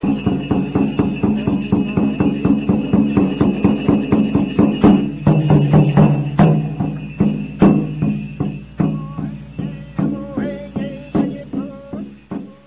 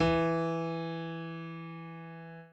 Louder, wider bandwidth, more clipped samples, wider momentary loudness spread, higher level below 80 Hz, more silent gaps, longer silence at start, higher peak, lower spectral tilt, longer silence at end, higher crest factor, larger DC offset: first, -17 LUFS vs -35 LUFS; second, 4 kHz vs 8.2 kHz; neither; about the same, 14 LU vs 16 LU; first, -36 dBFS vs -54 dBFS; neither; about the same, 0 s vs 0 s; first, -2 dBFS vs -16 dBFS; first, -12.5 dB/octave vs -7.5 dB/octave; first, 0.15 s vs 0 s; about the same, 14 dB vs 18 dB; neither